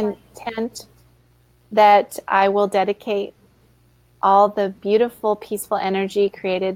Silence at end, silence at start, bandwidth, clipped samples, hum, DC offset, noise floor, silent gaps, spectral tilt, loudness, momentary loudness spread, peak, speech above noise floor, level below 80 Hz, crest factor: 0 s; 0 s; 16.5 kHz; under 0.1%; none; under 0.1%; -56 dBFS; none; -5 dB/octave; -19 LUFS; 13 LU; -4 dBFS; 38 dB; -60 dBFS; 16 dB